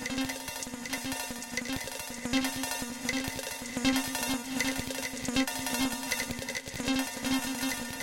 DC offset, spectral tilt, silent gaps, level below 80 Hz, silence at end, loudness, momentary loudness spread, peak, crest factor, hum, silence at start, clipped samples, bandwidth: under 0.1%; -2.5 dB/octave; none; -52 dBFS; 0 s; -32 LUFS; 6 LU; -14 dBFS; 20 dB; none; 0 s; under 0.1%; 17 kHz